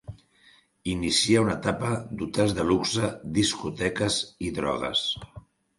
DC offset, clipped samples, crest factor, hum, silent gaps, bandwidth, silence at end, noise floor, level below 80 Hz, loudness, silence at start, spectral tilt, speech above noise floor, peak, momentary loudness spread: under 0.1%; under 0.1%; 20 dB; none; none; 11.5 kHz; 0.4 s; -59 dBFS; -50 dBFS; -26 LUFS; 0.1 s; -4 dB/octave; 33 dB; -8 dBFS; 9 LU